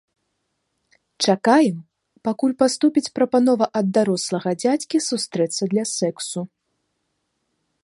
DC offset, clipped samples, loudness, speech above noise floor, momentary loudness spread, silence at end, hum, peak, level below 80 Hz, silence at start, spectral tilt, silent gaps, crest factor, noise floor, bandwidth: under 0.1%; under 0.1%; -20 LUFS; 54 dB; 11 LU; 1.4 s; none; -2 dBFS; -70 dBFS; 1.2 s; -4.5 dB/octave; none; 18 dB; -74 dBFS; 11.5 kHz